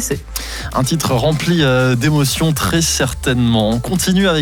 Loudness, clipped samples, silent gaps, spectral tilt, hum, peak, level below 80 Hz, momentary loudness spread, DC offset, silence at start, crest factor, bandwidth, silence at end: -15 LUFS; under 0.1%; none; -4.5 dB/octave; none; -4 dBFS; -30 dBFS; 7 LU; under 0.1%; 0 s; 10 dB; 19.5 kHz; 0 s